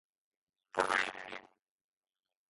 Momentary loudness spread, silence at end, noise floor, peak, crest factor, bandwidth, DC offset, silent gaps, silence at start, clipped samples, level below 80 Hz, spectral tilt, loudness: 16 LU; 1.05 s; under -90 dBFS; -14 dBFS; 28 dB; 11.5 kHz; under 0.1%; none; 0.75 s; under 0.1%; -76 dBFS; -2 dB/octave; -34 LUFS